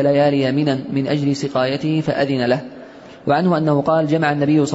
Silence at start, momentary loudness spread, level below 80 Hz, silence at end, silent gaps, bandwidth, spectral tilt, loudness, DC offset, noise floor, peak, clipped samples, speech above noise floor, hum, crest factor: 0 s; 5 LU; -56 dBFS; 0 s; none; 8 kHz; -7 dB/octave; -18 LUFS; under 0.1%; -38 dBFS; -6 dBFS; under 0.1%; 21 dB; none; 12 dB